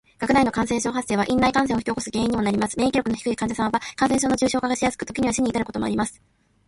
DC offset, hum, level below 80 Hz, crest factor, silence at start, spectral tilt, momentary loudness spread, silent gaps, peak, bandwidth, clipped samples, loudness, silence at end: under 0.1%; none; -48 dBFS; 18 dB; 0.2 s; -4.5 dB/octave; 6 LU; none; -6 dBFS; 11.5 kHz; under 0.1%; -23 LUFS; 0.55 s